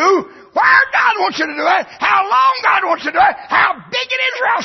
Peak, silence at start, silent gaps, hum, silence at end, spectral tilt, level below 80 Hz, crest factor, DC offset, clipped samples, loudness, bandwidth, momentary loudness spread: 0 dBFS; 0 s; none; none; 0 s; -2.5 dB/octave; -56 dBFS; 14 dB; under 0.1%; under 0.1%; -14 LUFS; 6.2 kHz; 7 LU